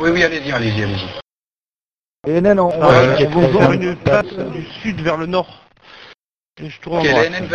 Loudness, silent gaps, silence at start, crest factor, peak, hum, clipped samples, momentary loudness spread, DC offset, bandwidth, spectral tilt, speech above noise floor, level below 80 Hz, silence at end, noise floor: -15 LUFS; 1.22-1.26 s, 1.39-1.47 s, 1.53-2.23 s, 6.16-6.38 s, 6.44-6.49 s; 0 s; 16 dB; 0 dBFS; none; under 0.1%; 17 LU; under 0.1%; 8.2 kHz; -6.5 dB/octave; over 75 dB; -42 dBFS; 0 s; under -90 dBFS